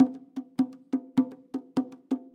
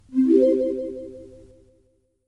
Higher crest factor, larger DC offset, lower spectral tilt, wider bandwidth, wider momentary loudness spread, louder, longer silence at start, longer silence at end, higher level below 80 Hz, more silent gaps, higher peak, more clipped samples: about the same, 20 dB vs 18 dB; neither; about the same, -7.5 dB/octave vs -8 dB/octave; first, 8.6 kHz vs 5.6 kHz; second, 9 LU vs 20 LU; second, -31 LUFS vs -20 LUFS; about the same, 0 s vs 0.1 s; second, 0.15 s vs 1 s; second, -76 dBFS vs -58 dBFS; neither; about the same, -8 dBFS vs -6 dBFS; neither